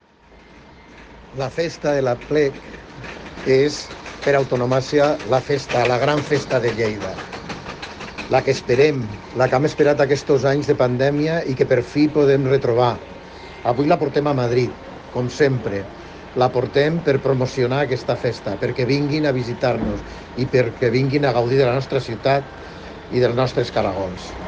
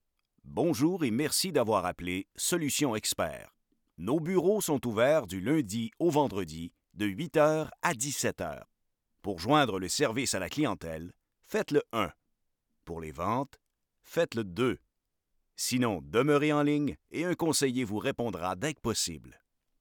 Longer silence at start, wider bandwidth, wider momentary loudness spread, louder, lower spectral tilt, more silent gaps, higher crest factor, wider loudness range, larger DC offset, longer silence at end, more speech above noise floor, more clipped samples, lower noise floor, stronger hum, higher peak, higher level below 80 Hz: about the same, 0.55 s vs 0.45 s; second, 9 kHz vs over 20 kHz; about the same, 14 LU vs 13 LU; first, -19 LUFS vs -30 LUFS; first, -6.5 dB/octave vs -4.5 dB/octave; neither; about the same, 16 dB vs 20 dB; about the same, 3 LU vs 5 LU; neither; second, 0 s vs 0.5 s; second, 30 dB vs 50 dB; neither; second, -48 dBFS vs -80 dBFS; neither; first, -4 dBFS vs -12 dBFS; first, -46 dBFS vs -62 dBFS